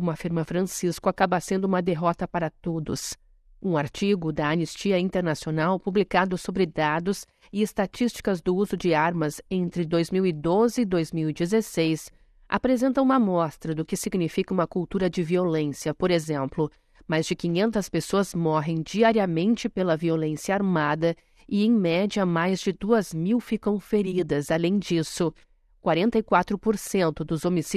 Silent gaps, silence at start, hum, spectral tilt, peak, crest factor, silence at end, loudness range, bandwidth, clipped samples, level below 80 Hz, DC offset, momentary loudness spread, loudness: none; 0 s; none; -6 dB/octave; -6 dBFS; 20 dB; 0 s; 2 LU; 14 kHz; under 0.1%; -52 dBFS; under 0.1%; 7 LU; -25 LUFS